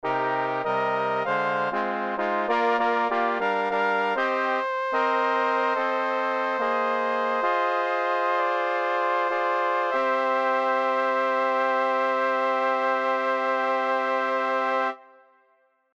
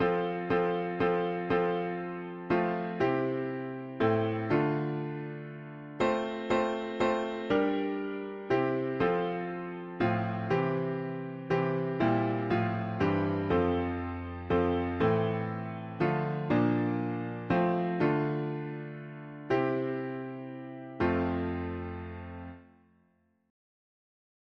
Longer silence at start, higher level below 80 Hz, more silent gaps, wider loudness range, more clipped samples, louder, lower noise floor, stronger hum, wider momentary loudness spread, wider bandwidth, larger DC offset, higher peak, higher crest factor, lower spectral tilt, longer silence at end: about the same, 0.05 s vs 0 s; second, -74 dBFS vs -56 dBFS; neither; second, 1 LU vs 4 LU; neither; first, -24 LUFS vs -31 LUFS; second, -65 dBFS vs -70 dBFS; neither; second, 2 LU vs 12 LU; about the same, 7.8 kHz vs 7.4 kHz; neither; first, -10 dBFS vs -14 dBFS; about the same, 14 dB vs 16 dB; second, -5 dB/octave vs -8.5 dB/octave; second, 0.95 s vs 1.85 s